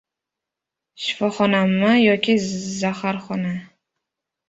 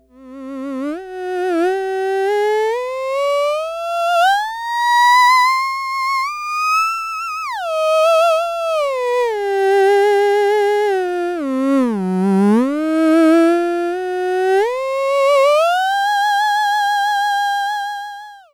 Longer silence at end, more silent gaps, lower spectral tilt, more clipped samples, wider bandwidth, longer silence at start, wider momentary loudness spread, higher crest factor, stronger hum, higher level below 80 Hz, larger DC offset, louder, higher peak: first, 0.85 s vs 0.15 s; neither; about the same, -5 dB/octave vs -4.5 dB/octave; neither; second, 8 kHz vs over 20 kHz; first, 1 s vs 0.2 s; about the same, 11 LU vs 10 LU; first, 18 dB vs 12 dB; second, none vs 60 Hz at -50 dBFS; about the same, -62 dBFS vs -60 dBFS; neither; second, -20 LUFS vs -16 LUFS; about the same, -4 dBFS vs -6 dBFS